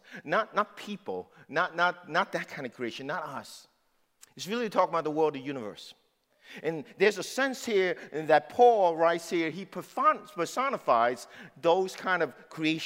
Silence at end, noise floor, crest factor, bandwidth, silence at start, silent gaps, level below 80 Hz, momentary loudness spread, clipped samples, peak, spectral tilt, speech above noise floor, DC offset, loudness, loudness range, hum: 0 s; -71 dBFS; 20 dB; 16 kHz; 0.1 s; none; -82 dBFS; 14 LU; under 0.1%; -10 dBFS; -4.5 dB/octave; 42 dB; under 0.1%; -29 LUFS; 7 LU; none